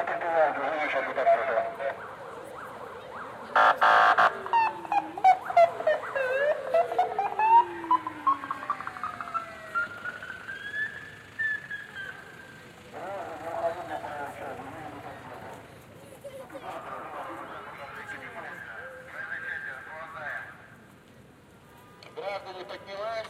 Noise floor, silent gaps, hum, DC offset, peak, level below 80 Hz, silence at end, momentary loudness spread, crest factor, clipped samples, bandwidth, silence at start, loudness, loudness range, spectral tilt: -54 dBFS; none; none; under 0.1%; -8 dBFS; -68 dBFS; 0 s; 20 LU; 20 dB; under 0.1%; 14.5 kHz; 0 s; -27 LUFS; 17 LU; -4 dB/octave